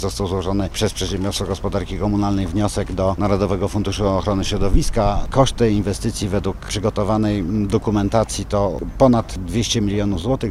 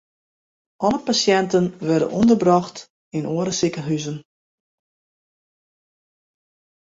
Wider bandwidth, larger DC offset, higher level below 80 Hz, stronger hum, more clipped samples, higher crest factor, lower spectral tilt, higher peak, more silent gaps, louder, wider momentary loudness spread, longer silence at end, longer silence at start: first, 14.5 kHz vs 7.8 kHz; neither; first, -28 dBFS vs -58 dBFS; neither; neither; about the same, 18 dB vs 20 dB; about the same, -6 dB/octave vs -5 dB/octave; about the same, -2 dBFS vs -2 dBFS; second, none vs 2.90-3.11 s; about the same, -20 LUFS vs -20 LUFS; second, 6 LU vs 14 LU; second, 0 s vs 2.75 s; second, 0 s vs 0.8 s